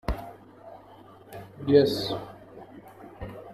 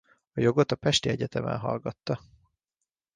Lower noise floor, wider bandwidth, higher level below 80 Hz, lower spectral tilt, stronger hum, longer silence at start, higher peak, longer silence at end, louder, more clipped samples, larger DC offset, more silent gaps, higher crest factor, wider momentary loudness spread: second, -50 dBFS vs -86 dBFS; first, 14.5 kHz vs 10 kHz; first, -46 dBFS vs -58 dBFS; first, -6.5 dB/octave vs -5 dB/octave; neither; second, 0.05 s vs 0.35 s; about the same, -8 dBFS vs -10 dBFS; second, 0 s vs 0.95 s; first, -25 LUFS vs -28 LUFS; neither; neither; neither; about the same, 22 dB vs 20 dB; first, 27 LU vs 10 LU